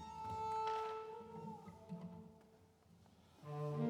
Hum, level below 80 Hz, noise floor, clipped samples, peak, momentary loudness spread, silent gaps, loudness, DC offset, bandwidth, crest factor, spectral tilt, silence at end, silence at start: none; -78 dBFS; -68 dBFS; under 0.1%; -28 dBFS; 25 LU; none; -47 LUFS; under 0.1%; 13.5 kHz; 18 dB; -7 dB/octave; 0 s; 0 s